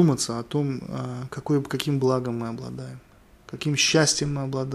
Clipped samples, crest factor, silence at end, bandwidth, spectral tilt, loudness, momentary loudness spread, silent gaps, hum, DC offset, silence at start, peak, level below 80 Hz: under 0.1%; 22 dB; 0 s; 14 kHz; -4.5 dB/octave; -25 LUFS; 15 LU; none; none; under 0.1%; 0 s; -4 dBFS; -54 dBFS